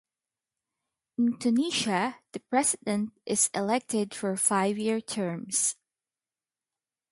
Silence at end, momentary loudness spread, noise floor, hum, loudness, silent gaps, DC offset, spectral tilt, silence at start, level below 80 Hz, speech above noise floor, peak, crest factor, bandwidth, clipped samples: 1.4 s; 7 LU; under -90 dBFS; none; -27 LUFS; none; under 0.1%; -3 dB/octave; 1.2 s; -74 dBFS; over 62 dB; -12 dBFS; 18 dB; 12 kHz; under 0.1%